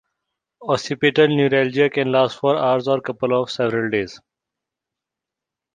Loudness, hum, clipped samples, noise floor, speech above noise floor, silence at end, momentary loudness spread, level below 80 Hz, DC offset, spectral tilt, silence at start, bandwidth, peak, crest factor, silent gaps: -19 LUFS; none; under 0.1%; -86 dBFS; 67 dB; 1.55 s; 7 LU; -62 dBFS; under 0.1%; -6 dB/octave; 0.6 s; 9.4 kHz; -2 dBFS; 18 dB; none